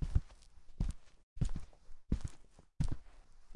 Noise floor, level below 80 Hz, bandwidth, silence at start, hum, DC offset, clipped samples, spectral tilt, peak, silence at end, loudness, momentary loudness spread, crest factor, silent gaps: -55 dBFS; -42 dBFS; 11 kHz; 0 s; none; under 0.1%; under 0.1%; -7 dB/octave; -16 dBFS; 0 s; -43 LUFS; 22 LU; 22 dB; 1.23-1.36 s